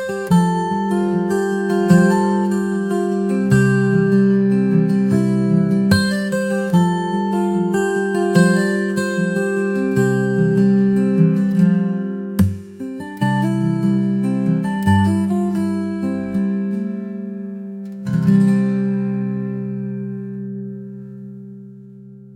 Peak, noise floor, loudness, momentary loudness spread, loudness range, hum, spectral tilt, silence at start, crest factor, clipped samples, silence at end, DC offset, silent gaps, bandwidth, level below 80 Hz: 0 dBFS; -39 dBFS; -17 LUFS; 14 LU; 4 LU; none; -7.5 dB/octave; 0 s; 16 dB; under 0.1%; 0 s; under 0.1%; none; 15.5 kHz; -52 dBFS